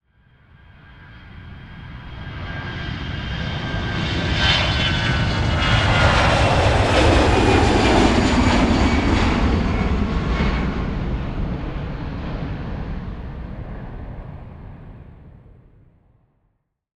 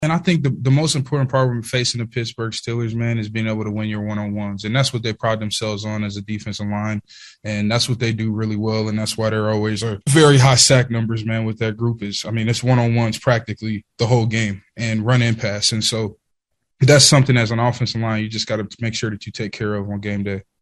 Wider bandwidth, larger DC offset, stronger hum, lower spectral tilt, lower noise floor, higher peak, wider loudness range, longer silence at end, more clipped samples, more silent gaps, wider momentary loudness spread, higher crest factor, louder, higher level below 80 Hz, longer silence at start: second, 11 kHz vs 12.5 kHz; neither; neither; about the same, -5.5 dB/octave vs -4.5 dB/octave; second, -68 dBFS vs -72 dBFS; about the same, -2 dBFS vs 0 dBFS; first, 18 LU vs 7 LU; first, 1.7 s vs 0.2 s; neither; neither; first, 21 LU vs 13 LU; about the same, 18 dB vs 18 dB; about the same, -19 LUFS vs -19 LUFS; first, -28 dBFS vs -50 dBFS; first, 0.9 s vs 0 s